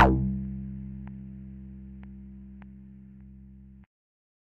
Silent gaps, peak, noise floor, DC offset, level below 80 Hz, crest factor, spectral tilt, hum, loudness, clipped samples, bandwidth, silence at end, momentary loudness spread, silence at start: none; -6 dBFS; -49 dBFS; under 0.1%; -40 dBFS; 26 dB; -5 dB/octave; none; -33 LUFS; under 0.1%; 3.7 kHz; 0.75 s; 19 LU; 0 s